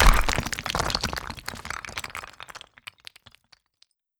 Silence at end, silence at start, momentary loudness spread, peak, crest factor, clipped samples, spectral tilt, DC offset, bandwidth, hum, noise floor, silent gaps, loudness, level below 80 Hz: 1.6 s; 0 s; 18 LU; -2 dBFS; 24 dB; under 0.1%; -3 dB/octave; under 0.1%; 20 kHz; none; -66 dBFS; none; -28 LUFS; -30 dBFS